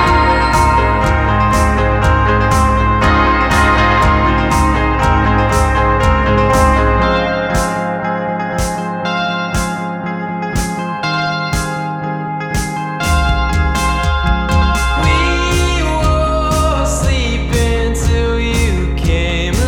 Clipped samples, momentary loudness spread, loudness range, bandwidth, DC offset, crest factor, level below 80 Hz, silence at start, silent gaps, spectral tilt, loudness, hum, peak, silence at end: under 0.1%; 8 LU; 6 LU; 16.5 kHz; under 0.1%; 14 dB; -18 dBFS; 0 s; none; -5.5 dB/octave; -14 LUFS; none; 0 dBFS; 0 s